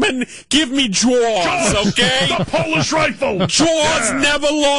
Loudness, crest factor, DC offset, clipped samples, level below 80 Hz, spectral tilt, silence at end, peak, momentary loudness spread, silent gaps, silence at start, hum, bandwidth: -15 LUFS; 12 dB; under 0.1%; under 0.1%; -40 dBFS; -3 dB/octave; 0 s; -4 dBFS; 3 LU; none; 0 s; none; 11.5 kHz